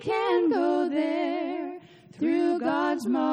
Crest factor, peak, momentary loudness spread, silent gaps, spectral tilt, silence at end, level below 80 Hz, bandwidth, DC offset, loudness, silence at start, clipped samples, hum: 12 dB; -14 dBFS; 9 LU; none; -5.5 dB/octave; 0 s; -74 dBFS; 10.5 kHz; under 0.1%; -26 LUFS; 0 s; under 0.1%; none